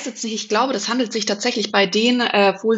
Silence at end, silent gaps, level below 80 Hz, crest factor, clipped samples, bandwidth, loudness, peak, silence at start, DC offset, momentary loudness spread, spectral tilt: 0 s; none; -68 dBFS; 18 dB; under 0.1%; 8.2 kHz; -19 LUFS; -2 dBFS; 0 s; under 0.1%; 5 LU; -3 dB/octave